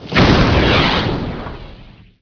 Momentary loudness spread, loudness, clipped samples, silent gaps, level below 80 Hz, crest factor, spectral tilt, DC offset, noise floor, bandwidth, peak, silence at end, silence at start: 19 LU; -13 LUFS; under 0.1%; none; -24 dBFS; 16 dB; -6 dB/octave; under 0.1%; -40 dBFS; 5.4 kHz; 0 dBFS; 0.4 s; 0 s